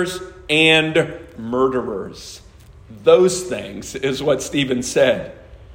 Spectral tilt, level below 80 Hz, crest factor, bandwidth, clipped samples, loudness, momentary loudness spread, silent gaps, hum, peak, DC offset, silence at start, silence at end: -4 dB/octave; -48 dBFS; 18 dB; 16 kHz; under 0.1%; -18 LUFS; 18 LU; none; none; 0 dBFS; under 0.1%; 0 s; 0 s